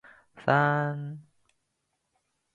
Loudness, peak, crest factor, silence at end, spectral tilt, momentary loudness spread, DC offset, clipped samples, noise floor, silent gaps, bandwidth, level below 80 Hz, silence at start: -27 LUFS; -8 dBFS; 24 dB; 1.35 s; -8 dB/octave; 18 LU; under 0.1%; under 0.1%; -79 dBFS; none; 7.4 kHz; -74 dBFS; 0.35 s